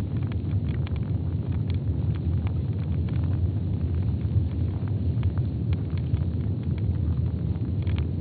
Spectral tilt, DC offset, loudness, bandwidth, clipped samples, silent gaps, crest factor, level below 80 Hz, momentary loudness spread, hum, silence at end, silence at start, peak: -9.5 dB/octave; under 0.1%; -27 LUFS; 4.5 kHz; under 0.1%; none; 14 dB; -34 dBFS; 2 LU; none; 0 s; 0 s; -12 dBFS